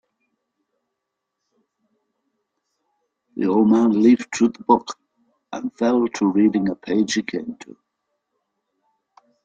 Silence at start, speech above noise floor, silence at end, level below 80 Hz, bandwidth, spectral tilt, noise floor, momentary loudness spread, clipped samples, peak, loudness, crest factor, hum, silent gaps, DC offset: 3.35 s; 62 dB; 1.9 s; -64 dBFS; 8.8 kHz; -5.5 dB/octave; -80 dBFS; 19 LU; under 0.1%; -2 dBFS; -19 LUFS; 20 dB; none; none; under 0.1%